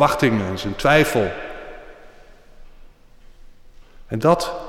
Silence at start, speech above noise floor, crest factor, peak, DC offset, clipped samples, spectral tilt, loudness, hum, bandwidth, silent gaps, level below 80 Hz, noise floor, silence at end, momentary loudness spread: 0 s; 27 dB; 18 dB; -4 dBFS; under 0.1%; under 0.1%; -5.5 dB/octave; -19 LUFS; none; 16.5 kHz; none; -42 dBFS; -45 dBFS; 0 s; 21 LU